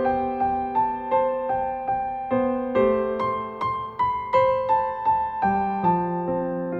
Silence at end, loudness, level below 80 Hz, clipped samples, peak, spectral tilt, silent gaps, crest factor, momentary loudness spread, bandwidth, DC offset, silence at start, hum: 0 s; -24 LUFS; -50 dBFS; under 0.1%; -8 dBFS; -9 dB/octave; none; 16 dB; 5 LU; 5.8 kHz; under 0.1%; 0 s; none